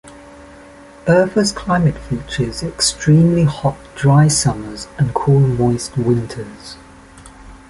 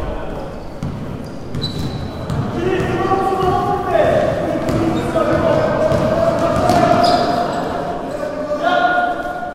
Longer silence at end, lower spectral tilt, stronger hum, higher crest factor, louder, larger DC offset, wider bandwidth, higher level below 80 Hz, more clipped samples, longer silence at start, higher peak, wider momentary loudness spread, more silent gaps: first, 0.15 s vs 0 s; about the same, -5.5 dB/octave vs -6.5 dB/octave; neither; about the same, 14 dB vs 16 dB; about the same, -16 LUFS vs -17 LUFS; neither; second, 11.5 kHz vs 15.5 kHz; second, -40 dBFS vs -34 dBFS; neither; about the same, 0.05 s vs 0 s; about the same, -2 dBFS vs 0 dBFS; first, 15 LU vs 12 LU; neither